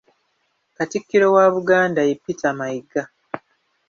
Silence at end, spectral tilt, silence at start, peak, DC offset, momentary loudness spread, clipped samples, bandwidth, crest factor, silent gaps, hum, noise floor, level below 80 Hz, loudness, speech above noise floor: 0.5 s; -5.5 dB/octave; 0.8 s; -2 dBFS; under 0.1%; 19 LU; under 0.1%; 7.2 kHz; 18 dB; none; none; -69 dBFS; -66 dBFS; -19 LUFS; 51 dB